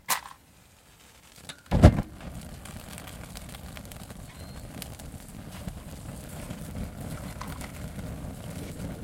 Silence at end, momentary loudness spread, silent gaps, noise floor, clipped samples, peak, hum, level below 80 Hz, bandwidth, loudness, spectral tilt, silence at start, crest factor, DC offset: 0 s; 13 LU; none; -56 dBFS; under 0.1%; 0 dBFS; none; -36 dBFS; 17 kHz; -31 LUFS; -6 dB/octave; 0.1 s; 30 dB; under 0.1%